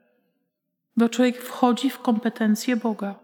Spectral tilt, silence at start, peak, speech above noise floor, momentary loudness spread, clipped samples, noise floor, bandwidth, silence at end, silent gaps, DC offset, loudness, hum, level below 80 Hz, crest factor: -5 dB/octave; 0.95 s; -4 dBFS; 56 dB; 4 LU; under 0.1%; -78 dBFS; 17.5 kHz; 0.1 s; none; under 0.1%; -23 LUFS; none; -82 dBFS; 20 dB